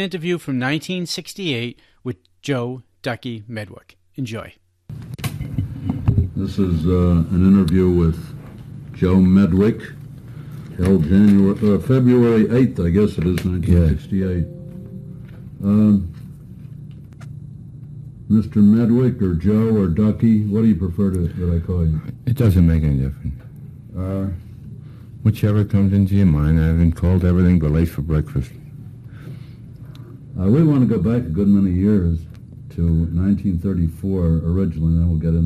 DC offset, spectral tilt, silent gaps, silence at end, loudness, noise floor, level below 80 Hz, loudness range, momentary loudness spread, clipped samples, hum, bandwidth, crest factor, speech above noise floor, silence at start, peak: under 0.1%; -8.5 dB/octave; none; 0 s; -18 LUFS; -37 dBFS; -32 dBFS; 8 LU; 22 LU; under 0.1%; none; 14 kHz; 14 dB; 20 dB; 0 s; -4 dBFS